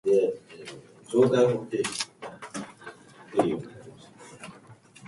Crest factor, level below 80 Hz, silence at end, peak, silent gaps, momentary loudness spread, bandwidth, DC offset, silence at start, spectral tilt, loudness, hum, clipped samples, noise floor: 20 dB; -68 dBFS; 0 s; -8 dBFS; none; 24 LU; 11.5 kHz; under 0.1%; 0.05 s; -5 dB/octave; -27 LUFS; none; under 0.1%; -52 dBFS